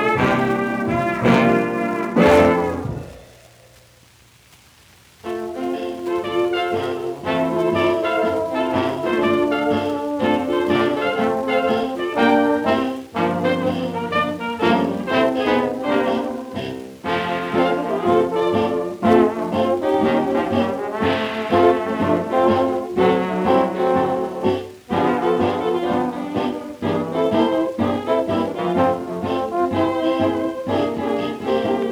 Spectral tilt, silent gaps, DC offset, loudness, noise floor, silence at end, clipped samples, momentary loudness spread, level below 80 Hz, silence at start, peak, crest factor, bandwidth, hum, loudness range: -6.5 dB/octave; none; under 0.1%; -20 LUFS; -51 dBFS; 0 s; under 0.1%; 8 LU; -50 dBFS; 0 s; -2 dBFS; 18 dB; 16 kHz; none; 3 LU